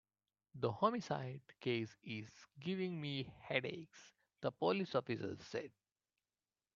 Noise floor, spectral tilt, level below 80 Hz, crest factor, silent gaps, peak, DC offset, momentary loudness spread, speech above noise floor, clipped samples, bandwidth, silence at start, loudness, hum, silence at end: under -90 dBFS; -4.5 dB/octave; -80 dBFS; 24 dB; none; -20 dBFS; under 0.1%; 15 LU; over 48 dB; under 0.1%; 7.6 kHz; 0.55 s; -42 LUFS; none; 1.05 s